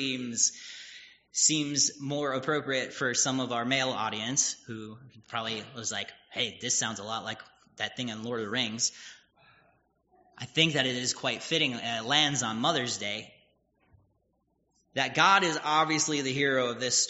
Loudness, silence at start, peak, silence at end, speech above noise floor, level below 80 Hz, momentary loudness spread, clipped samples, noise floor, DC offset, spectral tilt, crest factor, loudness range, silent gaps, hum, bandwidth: -28 LUFS; 0 s; -6 dBFS; 0 s; 44 dB; -72 dBFS; 14 LU; under 0.1%; -74 dBFS; under 0.1%; -1.5 dB/octave; 24 dB; 6 LU; none; none; 8 kHz